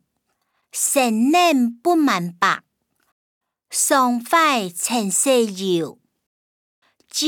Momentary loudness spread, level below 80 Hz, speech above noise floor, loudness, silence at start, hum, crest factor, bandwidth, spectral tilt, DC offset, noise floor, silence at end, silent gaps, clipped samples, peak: 9 LU; -76 dBFS; 54 dB; -18 LUFS; 0.75 s; none; 18 dB; over 20 kHz; -2.5 dB/octave; under 0.1%; -72 dBFS; 0 s; 3.12-3.41 s, 6.26-6.82 s; under 0.1%; -4 dBFS